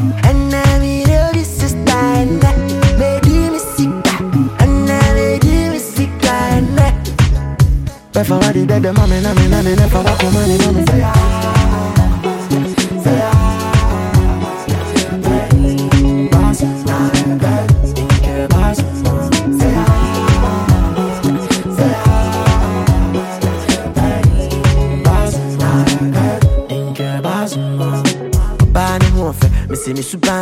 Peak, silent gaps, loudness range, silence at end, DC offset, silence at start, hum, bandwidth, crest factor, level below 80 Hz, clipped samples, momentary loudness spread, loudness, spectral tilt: 0 dBFS; none; 2 LU; 0 s; under 0.1%; 0 s; none; 16.5 kHz; 12 dB; -20 dBFS; under 0.1%; 5 LU; -13 LUFS; -6 dB/octave